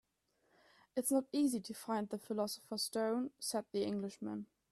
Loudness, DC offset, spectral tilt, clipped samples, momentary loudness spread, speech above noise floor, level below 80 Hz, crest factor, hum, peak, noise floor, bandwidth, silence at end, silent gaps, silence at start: -39 LUFS; under 0.1%; -4 dB/octave; under 0.1%; 8 LU; 41 dB; -82 dBFS; 16 dB; none; -24 dBFS; -79 dBFS; 15.5 kHz; 0.25 s; none; 0.95 s